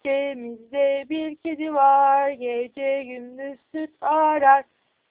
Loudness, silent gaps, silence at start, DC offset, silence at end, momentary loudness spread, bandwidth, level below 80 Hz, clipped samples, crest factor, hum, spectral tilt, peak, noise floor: -21 LUFS; none; 0.05 s; under 0.1%; 0.5 s; 17 LU; 4 kHz; -72 dBFS; under 0.1%; 18 dB; none; -7 dB/octave; -4 dBFS; -48 dBFS